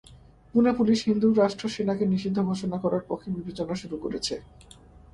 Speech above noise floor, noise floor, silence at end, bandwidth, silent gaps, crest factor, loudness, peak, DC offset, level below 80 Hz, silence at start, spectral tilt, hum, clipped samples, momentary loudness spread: 26 dB; -52 dBFS; 0.5 s; 11.5 kHz; none; 18 dB; -26 LUFS; -8 dBFS; under 0.1%; -56 dBFS; 0.1 s; -6.5 dB/octave; none; under 0.1%; 11 LU